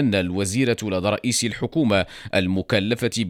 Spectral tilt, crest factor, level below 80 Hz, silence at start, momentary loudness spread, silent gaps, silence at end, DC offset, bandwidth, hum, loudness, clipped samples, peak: -4.5 dB/octave; 16 dB; -52 dBFS; 0 s; 3 LU; none; 0 s; under 0.1%; 17.5 kHz; none; -22 LUFS; under 0.1%; -6 dBFS